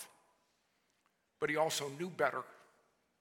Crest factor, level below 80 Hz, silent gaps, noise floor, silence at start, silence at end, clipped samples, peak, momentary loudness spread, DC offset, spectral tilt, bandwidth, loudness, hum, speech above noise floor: 22 dB; -86 dBFS; none; -78 dBFS; 0 s; 0.65 s; under 0.1%; -18 dBFS; 16 LU; under 0.1%; -3 dB/octave; 17.5 kHz; -37 LUFS; none; 42 dB